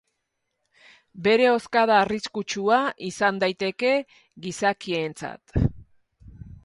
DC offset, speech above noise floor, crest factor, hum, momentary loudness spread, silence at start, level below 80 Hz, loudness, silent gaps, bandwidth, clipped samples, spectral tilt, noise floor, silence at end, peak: under 0.1%; 55 dB; 20 dB; none; 11 LU; 1.15 s; -44 dBFS; -23 LUFS; none; 11.5 kHz; under 0.1%; -5 dB/octave; -78 dBFS; 0.1 s; -4 dBFS